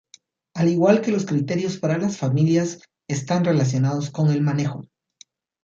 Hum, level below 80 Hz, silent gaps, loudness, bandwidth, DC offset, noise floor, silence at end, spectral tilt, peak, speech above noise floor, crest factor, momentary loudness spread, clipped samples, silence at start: none; -62 dBFS; none; -21 LUFS; 7.6 kHz; under 0.1%; -54 dBFS; 0.8 s; -7 dB/octave; -4 dBFS; 34 dB; 18 dB; 11 LU; under 0.1%; 0.55 s